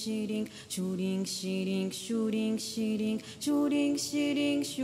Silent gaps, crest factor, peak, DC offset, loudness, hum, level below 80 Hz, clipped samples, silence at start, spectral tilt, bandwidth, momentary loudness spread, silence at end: none; 12 dB; -20 dBFS; under 0.1%; -32 LUFS; none; -74 dBFS; under 0.1%; 0 s; -4.5 dB/octave; 16 kHz; 6 LU; 0 s